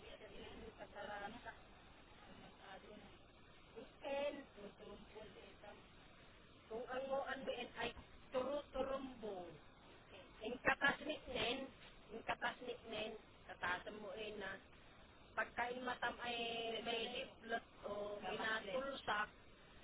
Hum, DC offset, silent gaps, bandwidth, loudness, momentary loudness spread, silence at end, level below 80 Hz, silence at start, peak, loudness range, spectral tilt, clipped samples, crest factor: none; under 0.1%; none; 4 kHz; -45 LUFS; 21 LU; 0 s; -68 dBFS; 0 s; -22 dBFS; 9 LU; -1 dB/octave; under 0.1%; 26 dB